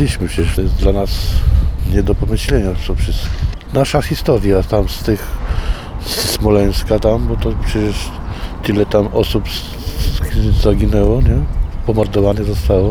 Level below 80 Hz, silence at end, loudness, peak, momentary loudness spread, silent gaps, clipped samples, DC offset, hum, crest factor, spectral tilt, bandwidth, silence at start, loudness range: -18 dBFS; 0 s; -16 LUFS; 0 dBFS; 8 LU; none; under 0.1%; under 0.1%; none; 14 dB; -6 dB/octave; 19.5 kHz; 0 s; 2 LU